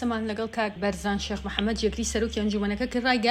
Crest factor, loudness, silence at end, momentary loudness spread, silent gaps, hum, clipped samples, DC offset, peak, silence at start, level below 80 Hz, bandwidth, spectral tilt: 20 dB; -27 LUFS; 0 s; 4 LU; none; none; under 0.1%; under 0.1%; -8 dBFS; 0 s; -42 dBFS; 14 kHz; -4 dB/octave